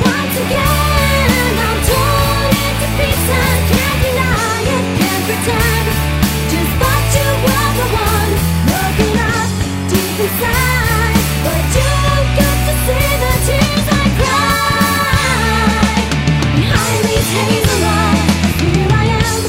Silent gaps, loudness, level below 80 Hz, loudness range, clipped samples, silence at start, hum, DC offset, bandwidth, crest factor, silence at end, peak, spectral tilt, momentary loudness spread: none; -13 LUFS; -20 dBFS; 1 LU; under 0.1%; 0 s; none; under 0.1%; 16.5 kHz; 12 dB; 0 s; 0 dBFS; -4.5 dB/octave; 3 LU